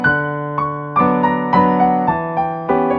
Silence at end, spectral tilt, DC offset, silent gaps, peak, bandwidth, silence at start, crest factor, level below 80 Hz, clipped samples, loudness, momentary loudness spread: 0 s; -9.5 dB/octave; under 0.1%; none; 0 dBFS; 5.4 kHz; 0 s; 16 dB; -46 dBFS; under 0.1%; -16 LUFS; 7 LU